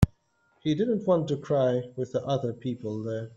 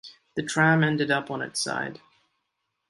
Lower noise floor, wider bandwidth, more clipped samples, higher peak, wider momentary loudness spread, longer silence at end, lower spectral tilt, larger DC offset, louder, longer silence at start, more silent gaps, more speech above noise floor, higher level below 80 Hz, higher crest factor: second, -68 dBFS vs -79 dBFS; second, 8.2 kHz vs 11.5 kHz; neither; about the same, -6 dBFS vs -6 dBFS; second, 8 LU vs 14 LU; second, 0 s vs 0.95 s; first, -8 dB/octave vs -4.5 dB/octave; neither; second, -28 LUFS vs -25 LUFS; about the same, 0 s vs 0.05 s; neither; second, 41 dB vs 54 dB; first, -46 dBFS vs -68 dBFS; about the same, 22 dB vs 20 dB